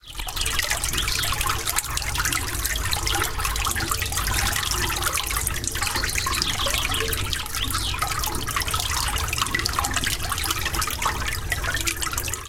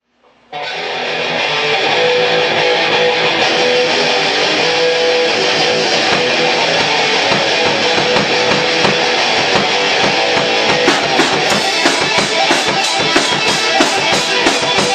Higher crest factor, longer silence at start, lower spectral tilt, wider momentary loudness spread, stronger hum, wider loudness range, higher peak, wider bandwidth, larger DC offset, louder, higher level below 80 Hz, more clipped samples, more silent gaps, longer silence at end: first, 22 dB vs 14 dB; second, 0.05 s vs 0.5 s; about the same, -1.5 dB/octave vs -2 dB/octave; about the same, 3 LU vs 1 LU; neither; about the same, 1 LU vs 0 LU; about the same, -2 dBFS vs 0 dBFS; first, 17 kHz vs 13 kHz; neither; second, -24 LUFS vs -12 LUFS; first, -32 dBFS vs -52 dBFS; neither; neither; about the same, 0 s vs 0 s